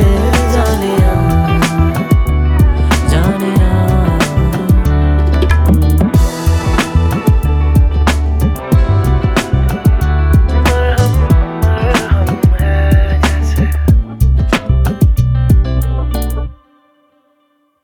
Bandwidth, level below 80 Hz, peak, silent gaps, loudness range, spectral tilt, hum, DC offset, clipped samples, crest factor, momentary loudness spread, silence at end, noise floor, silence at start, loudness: 17 kHz; -14 dBFS; 0 dBFS; none; 1 LU; -6.5 dB/octave; none; under 0.1%; under 0.1%; 10 dB; 3 LU; 1.3 s; -58 dBFS; 0 s; -12 LUFS